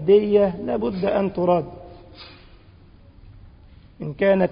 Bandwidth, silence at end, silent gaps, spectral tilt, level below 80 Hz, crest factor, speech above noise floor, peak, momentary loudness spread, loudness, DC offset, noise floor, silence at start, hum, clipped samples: 5.2 kHz; 0 s; none; -11.5 dB/octave; -48 dBFS; 16 dB; 29 dB; -6 dBFS; 25 LU; -21 LUFS; under 0.1%; -48 dBFS; 0 s; none; under 0.1%